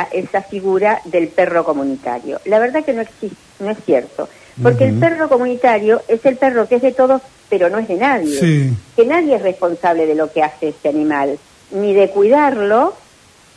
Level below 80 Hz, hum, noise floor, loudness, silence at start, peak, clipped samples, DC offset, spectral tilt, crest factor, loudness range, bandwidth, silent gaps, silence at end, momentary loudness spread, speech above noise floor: -56 dBFS; none; -47 dBFS; -15 LUFS; 0 s; 0 dBFS; under 0.1%; under 0.1%; -7 dB/octave; 14 dB; 3 LU; 11 kHz; none; 0.6 s; 10 LU; 32 dB